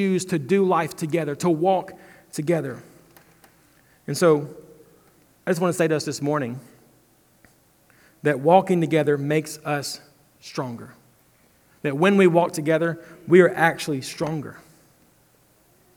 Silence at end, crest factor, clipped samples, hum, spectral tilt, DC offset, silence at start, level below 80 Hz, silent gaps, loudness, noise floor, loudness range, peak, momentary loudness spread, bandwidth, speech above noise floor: 1.4 s; 22 dB; under 0.1%; none; -6 dB/octave; under 0.1%; 0 s; -68 dBFS; none; -22 LUFS; -59 dBFS; 6 LU; -2 dBFS; 17 LU; 18.5 kHz; 38 dB